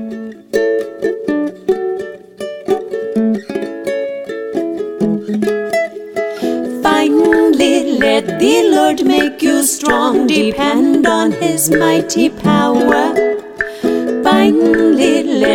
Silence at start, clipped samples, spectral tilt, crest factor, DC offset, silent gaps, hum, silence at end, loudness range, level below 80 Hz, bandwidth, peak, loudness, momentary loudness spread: 0 s; under 0.1%; -4 dB/octave; 14 dB; under 0.1%; none; none; 0 s; 7 LU; -46 dBFS; 18 kHz; 0 dBFS; -14 LUFS; 11 LU